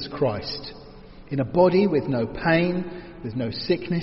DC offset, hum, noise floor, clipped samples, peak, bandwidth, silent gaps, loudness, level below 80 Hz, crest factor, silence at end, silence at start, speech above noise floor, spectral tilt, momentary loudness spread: under 0.1%; none; -44 dBFS; under 0.1%; -6 dBFS; 5.8 kHz; none; -24 LUFS; -48 dBFS; 18 dB; 0 s; 0 s; 21 dB; -5.5 dB/octave; 15 LU